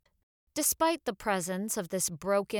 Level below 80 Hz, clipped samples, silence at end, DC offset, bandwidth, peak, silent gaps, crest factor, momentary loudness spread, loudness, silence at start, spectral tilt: -64 dBFS; under 0.1%; 0 s; under 0.1%; over 20 kHz; -14 dBFS; none; 18 dB; 6 LU; -30 LUFS; 0.55 s; -3 dB/octave